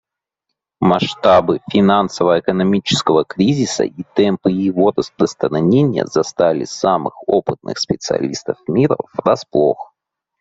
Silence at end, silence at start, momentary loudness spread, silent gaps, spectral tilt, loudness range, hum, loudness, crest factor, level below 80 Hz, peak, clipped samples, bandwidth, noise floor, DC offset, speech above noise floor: 0.55 s; 0.8 s; 6 LU; none; -6 dB/octave; 3 LU; none; -16 LUFS; 16 dB; -54 dBFS; 0 dBFS; under 0.1%; 8 kHz; -78 dBFS; under 0.1%; 63 dB